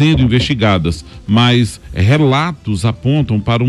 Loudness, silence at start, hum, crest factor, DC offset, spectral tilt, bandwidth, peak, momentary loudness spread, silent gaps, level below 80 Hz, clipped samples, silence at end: -13 LUFS; 0 s; none; 10 dB; under 0.1%; -6.5 dB/octave; 12 kHz; -2 dBFS; 7 LU; none; -32 dBFS; under 0.1%; 0 s